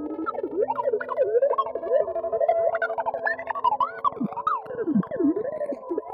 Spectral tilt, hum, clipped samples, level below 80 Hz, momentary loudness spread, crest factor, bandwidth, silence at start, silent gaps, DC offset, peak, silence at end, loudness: -9 dB/octave; none; under 0.1%; -66 dBFS; 7 LU; 16 dB; 5.4 kHz; 0 s; none; under 0.1%; -10 dBFS; 0 s; -26 LUFS